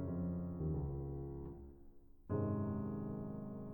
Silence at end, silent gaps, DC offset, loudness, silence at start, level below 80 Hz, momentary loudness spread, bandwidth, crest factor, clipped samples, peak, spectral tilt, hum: 0 s; none; under 0.1%; -43 LUFS; 0 s; -54 dBFS; 12 LU; 19 kHz; 14 dB; under 0.1%; -28 dBFS; -13 dB/octave; none